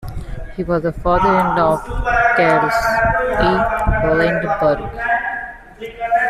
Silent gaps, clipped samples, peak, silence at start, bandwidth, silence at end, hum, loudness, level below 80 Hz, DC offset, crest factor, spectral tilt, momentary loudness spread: none; under 0.1%; -4 dBFS; 0 s; 14 kHz; 0 s; none; -16 LUFS; -30 dBFS; under 0.1%; 14 dB; -6.5 dB/octave; 14 LU